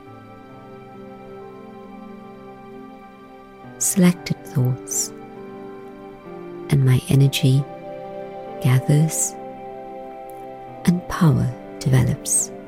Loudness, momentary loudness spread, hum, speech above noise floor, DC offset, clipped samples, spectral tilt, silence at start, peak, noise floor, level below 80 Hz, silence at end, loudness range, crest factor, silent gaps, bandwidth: -20 LUFS; 23 LU; none; 24 dB; under 0.1%; under 0.1%; -5.5 dB/octave; 0.05 s; -4 dBFS; -43 dBFS; -48 dBFS; 0 s; 10 LU; 18 dB; none; 16 kHz